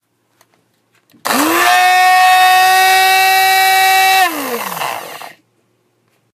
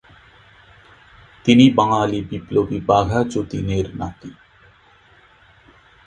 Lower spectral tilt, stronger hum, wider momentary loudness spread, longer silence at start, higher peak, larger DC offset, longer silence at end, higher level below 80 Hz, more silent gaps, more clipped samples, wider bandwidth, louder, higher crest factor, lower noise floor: second, 0 dB/octave vs -6.5 dB/octave; neither; second, 14 LU vs 18 LU; second, 1.25 s vs 1.45 s; about the same, 0 dBFS vs 0 dBFS; neither; second, 1.05 s vs 1.75 s; second, -68 dBFS vs -42 dBFS; neither; neither; first, 16 kHz vs 9.4 kHz; first, -10 LUFS vs -18 LUFS; second, 12 dB vs 20 dB; first, -60 dBFS vs -52 dBFS